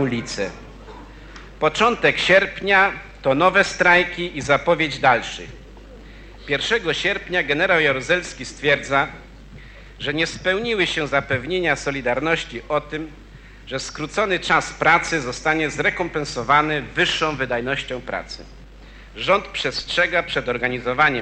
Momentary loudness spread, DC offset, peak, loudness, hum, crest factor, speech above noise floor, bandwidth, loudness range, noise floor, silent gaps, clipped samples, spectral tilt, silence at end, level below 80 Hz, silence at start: 13 LU; under 0.1%; -2 dBFS; -20 LUFS; none; 20 dB; 21 dB; 10 kHz; 6 LU; -42 dBFS; none; under 0.1%; -4 dB/octave; 0 s; -44 dBFS; 0 s